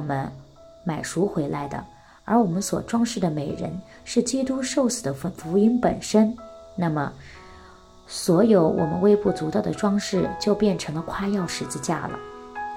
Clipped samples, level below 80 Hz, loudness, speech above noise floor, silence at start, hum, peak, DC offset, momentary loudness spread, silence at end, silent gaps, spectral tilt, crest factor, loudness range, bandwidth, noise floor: under 0.1%; -52 dBFS; -24 LUFS; 25 dB; 0 s; none; -6 dBFS; under 0.1%; 15 LU; 0 s; none; -5.5 dB/octave; 18 dB; 4 LU; 16 kHz; -48 dBFS